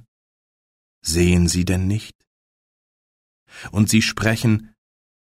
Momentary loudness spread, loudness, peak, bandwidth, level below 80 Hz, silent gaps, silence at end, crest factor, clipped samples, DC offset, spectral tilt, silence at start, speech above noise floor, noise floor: 12 LU; -19 LUFS; -4 dBFS; 16 kHz; -40 dBFS; 2.15-2.19 s, 2.27-3.46 s; 0.55 s; 18 dB; under 0.1%; under 0.1%; -5 dB/octave; 1.05 s; over 71 dB; under -90 dBFS